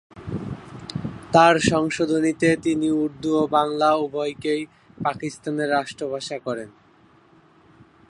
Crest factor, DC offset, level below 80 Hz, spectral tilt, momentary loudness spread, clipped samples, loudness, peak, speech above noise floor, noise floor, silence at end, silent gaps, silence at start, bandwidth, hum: 22 dB; under 0.1%; -54 dBFS; -5 dB/octave; 15 LU; under 0.1%; -22 LUFS; -2 dBFS; 34 dB; -55 dBFS; 1.4 s; none; 0.15 s; 11.5 kHz; none